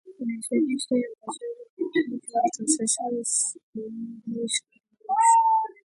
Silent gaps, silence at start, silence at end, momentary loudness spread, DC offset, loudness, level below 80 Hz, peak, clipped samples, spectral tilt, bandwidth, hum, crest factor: 1.70-1.77 s, 3.63-3.73 s; 0.05 s; 0.25 s; 17 LU; under 0.1%; -25 LUFS; -78 dBFS; -8 dBFS; under 0.1%; -2.5 dB/octave; 11.5 kHz; none; 18 dB